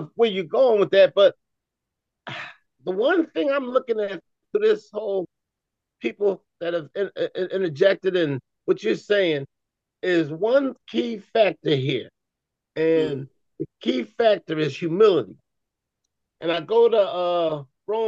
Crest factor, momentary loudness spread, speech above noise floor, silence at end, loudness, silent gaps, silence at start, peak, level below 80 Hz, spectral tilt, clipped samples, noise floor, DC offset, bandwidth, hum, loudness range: 18 dB; 15 LU; 62 dB; 0 s; -22 LUFS; none; 0 s; -6 dBFS; -74 dBFS; -6.5 dB/octave; under 0.1%; -83 dBFS; under 0.1%; 7.6 kHz; none; 4 LU